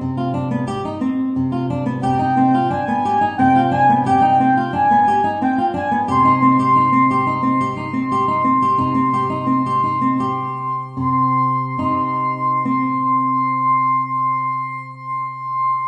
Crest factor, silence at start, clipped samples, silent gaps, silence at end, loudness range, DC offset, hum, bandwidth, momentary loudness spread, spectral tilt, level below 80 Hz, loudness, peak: 14 dB; 0 s; under 0.1%; none; 0 s; 4 LU; under 0.1%; none; 9.2 kHz; 8 LU; -8 dB/octave; -52 dBFS; -17 LUFS; -2 dBFS